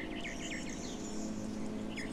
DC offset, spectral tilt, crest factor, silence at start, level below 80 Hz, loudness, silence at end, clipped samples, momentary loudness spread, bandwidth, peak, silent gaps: 0.2%; -4 dB/octave; 12 dB; 0 s; -52 dBFS; -41 LUFS; 0 s; under 0.1%; 1 LU; 14.5 kHz; -28 dBFS; none